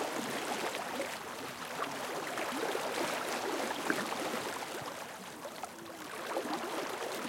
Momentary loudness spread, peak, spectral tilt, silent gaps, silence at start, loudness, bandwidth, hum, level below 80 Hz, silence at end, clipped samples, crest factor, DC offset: 9 LU; -14 dBFS; -2.5 dB/octave; none; 0 s; -37 LUFS; 17 kHz; none; -78 dBFS; 0 s; under 0.1%; 24 dB; under 0.1%